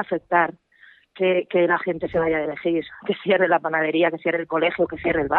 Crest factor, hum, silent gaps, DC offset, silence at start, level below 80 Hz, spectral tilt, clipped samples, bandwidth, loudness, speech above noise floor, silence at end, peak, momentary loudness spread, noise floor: 18 dB; none; none; under 0.1%; 0 s; -54 dBFS; -9 dB/octave; under 0.1%; 4.2 kHz; -22 LUFS; 32 dB; 0 s; -4 dBFS; 5 LU; -53 dBFS